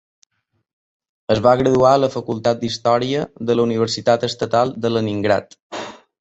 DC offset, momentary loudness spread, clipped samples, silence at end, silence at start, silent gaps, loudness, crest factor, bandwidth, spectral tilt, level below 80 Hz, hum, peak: under 0.1%; 17 LU; under 0.1%; 0.25 s; 1.3 s; 5.62-5.70 s; -18 LUFS; 18 dB; 8.2 kHz; -5.5 dB/octave; -50 dBFS; none; -2 dBFS